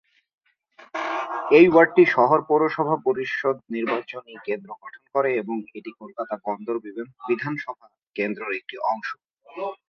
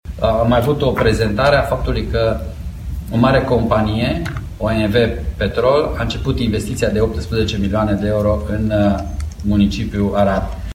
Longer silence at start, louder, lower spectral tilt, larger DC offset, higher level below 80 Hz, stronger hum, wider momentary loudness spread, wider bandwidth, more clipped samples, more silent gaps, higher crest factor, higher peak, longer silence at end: first, 0.95 s vs 0.05 s; second, -22 LUFS vs -17 LUFS; about the same, -7 dB/octave vs -7 dB/octave; neither; second, -66 dBFS vs -26 dBFS; neither; first, 21 LU vs 8 LU; second, 6.6 kHz vs 16.5 kHz; neither; first, 8.07-8.11 s vs none; about the same, 20 dB vs 16 dB; about the same, -2 dBFS vs 0 dBFS; first, 0.15 s vs 0 s